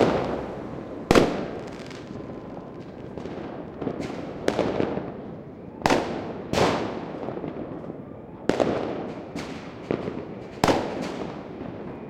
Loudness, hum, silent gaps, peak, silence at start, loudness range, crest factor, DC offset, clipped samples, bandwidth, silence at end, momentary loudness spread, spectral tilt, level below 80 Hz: -28 LUFS; none; none; -2 dBFS; 0 s; 4 LU; 26 dB; under 0.1%; under 0.1%; 16.5 kHz; 0 s; 15 LU; -5.5 dB/octave; -50 dBFS